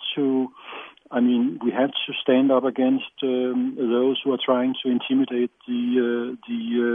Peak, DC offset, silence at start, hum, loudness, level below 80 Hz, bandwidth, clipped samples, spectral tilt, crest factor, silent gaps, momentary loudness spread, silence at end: -6 dBFS; under 0.1%; 0 s; none; -23 LUFS; -74 dBFS; 3.7 kHz; under 0.1%; -8 dB/octave; 16 dB; none; 8 LU; 0 s